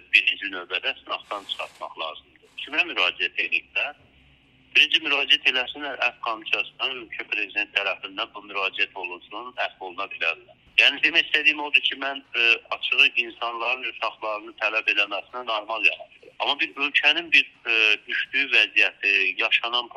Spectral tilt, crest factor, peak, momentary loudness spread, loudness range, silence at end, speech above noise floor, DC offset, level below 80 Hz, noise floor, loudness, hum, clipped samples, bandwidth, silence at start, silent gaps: -0.5 dB/octave; 24 dB; 0 dBFS; 14 LU; 7 LU; 0.1 s; 33 dB; under 0.1%; -70 dBFS; -57 dBFS; -22 LUFS; none; under 0.1%; 12.5 kHz; 0.1 s; none